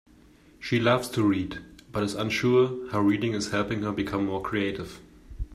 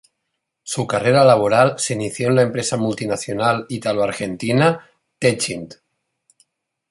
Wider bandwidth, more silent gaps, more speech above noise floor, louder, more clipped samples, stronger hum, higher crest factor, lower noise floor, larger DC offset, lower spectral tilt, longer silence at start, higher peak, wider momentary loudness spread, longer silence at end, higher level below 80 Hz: first, 14 kHz vs 11.5 kHz; neither; second, 29 dB vs 59 dB; second, -26 LUFS vs -18 LUFS; neither; neither; about the same, 18 dB vs 18 dB; second, -55 dBFS vs -77 dBFS; neither; about the same, -6 dB/octave vs -5 dB/octave; about the same, 0.6 s vs 0.65 s; second, -8 dBFS vs -2 dBFS; about the same, 14 LU vs 12 LU; second, 0 s vs 1.15 s; first, -48 dBFS vs -56 dBFS